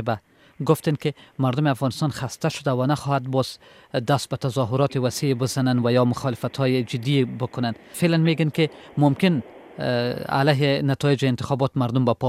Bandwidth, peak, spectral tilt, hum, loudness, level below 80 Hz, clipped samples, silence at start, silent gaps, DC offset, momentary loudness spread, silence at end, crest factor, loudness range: 15.5 kHz; -4 dBFS; -6.5 dB/octave; none; -23 LUFS; -58 dBFS; under 0.1%; 0 s; none; under 0.1%; 8 LU; 0 s; 18 dB; 2 LU